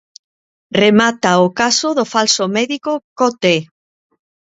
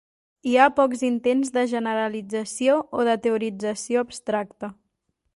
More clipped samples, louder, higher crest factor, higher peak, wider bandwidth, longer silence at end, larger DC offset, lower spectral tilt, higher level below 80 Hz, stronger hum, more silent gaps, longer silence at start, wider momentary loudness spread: neither; first, -14 LUFS vs -23 LUFS; about the same, 16 dB vs 20 dB; about the same, 0 dBFS vs -2 dBFS; second, 8 kHz vs 11.5 kHz; about the same, 0.75 s vs 0.65 s; neither; about the same, -3.5 dB/octave vs -4 dB/octave; first, -58 dBFS vs -66 dBFS; neither; first, 3.04-3.16 s vs none; first, 0.7 s vs 0.45 s; second, 7 LU vs 11 LU